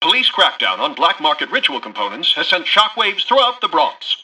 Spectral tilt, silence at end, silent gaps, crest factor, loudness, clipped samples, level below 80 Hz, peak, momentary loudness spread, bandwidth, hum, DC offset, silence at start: -1.5 dB/octave; 0 s; none; 16 dB; -15 LUFS; under 0.1%; -64 dBFS; 0 dBFS; 5 LU; 12 kHz; none; under 0.1%; 0 s